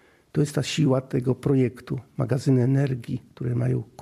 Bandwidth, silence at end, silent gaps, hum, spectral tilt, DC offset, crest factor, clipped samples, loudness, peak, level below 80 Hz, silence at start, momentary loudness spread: 12.5 kHz; 0 s; none; none; -7 dB/octave; under 0.1%; 14 dB; under 0.1%; -25 LUFS; -10 dBFS; -56 dBFS; 0.35 s; 10 LU